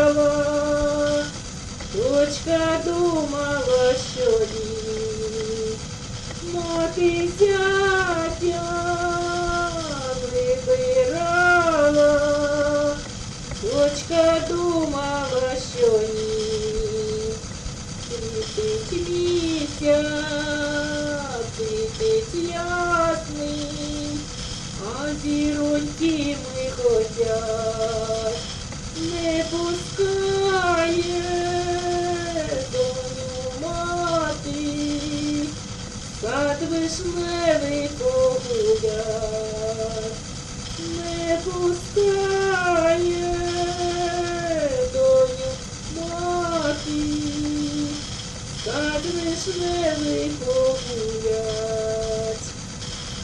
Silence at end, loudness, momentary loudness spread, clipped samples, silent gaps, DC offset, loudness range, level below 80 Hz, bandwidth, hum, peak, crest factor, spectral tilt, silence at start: 0 s; -23 LUFS; 10 LU; under 0.1%; none; under 0.1%; 5 LU; -40 dBFS; 11 kHz; none; -6 dBFS; 18 dB; -4.5 dB/octave; 0 s